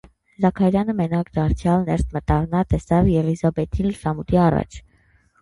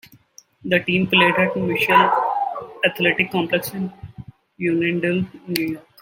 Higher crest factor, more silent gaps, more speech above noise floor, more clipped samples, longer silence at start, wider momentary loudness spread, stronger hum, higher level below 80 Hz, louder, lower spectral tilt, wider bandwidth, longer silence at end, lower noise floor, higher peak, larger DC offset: about the same, 16 dB vs 20 dB; neither; first, 39 dB vs 31 dB; neither; second, 0.4 s vs 0.65 s; second, 6 LU vs 13 LU; neither; first, -32 dBFS vs -58 dBFS; about the same, -21 LUFS vs -19 LUFS; first, -8.5 dB/octave vs -5.5 dB/octave; second, 11.5 kHz vs 16.5 kHz; first, 0.6 s vs 0.2 s; first, -58 dBFS vs -51 dBFS; second, -4 dBFS vs 0 dBFS; neither